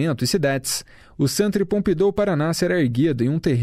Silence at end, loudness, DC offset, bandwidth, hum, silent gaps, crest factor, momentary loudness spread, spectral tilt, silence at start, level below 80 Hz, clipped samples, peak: 0 s; -21 LUFS; under 0.1%; 16 kHz; none; none; 14 dB; 4 LU; -5.5 dB/octave; 0 s; -46 dBFS; under 0.1%; -8 dBFS